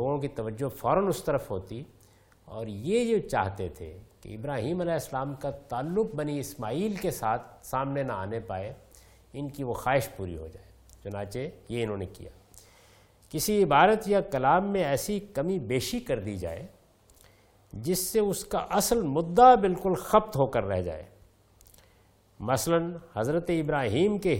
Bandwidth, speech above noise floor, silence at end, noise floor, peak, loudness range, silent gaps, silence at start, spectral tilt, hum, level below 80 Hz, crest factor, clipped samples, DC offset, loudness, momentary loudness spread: 17 kHz; 34 dB; 0 s; -62 dBFS; -6 dBFS; 9 LU; none; 0 s; -5.5 dB/octave; none; -52 dBFS; 24 dB; under 0.1%; under 0.1%; -28 LUFS; 16 LU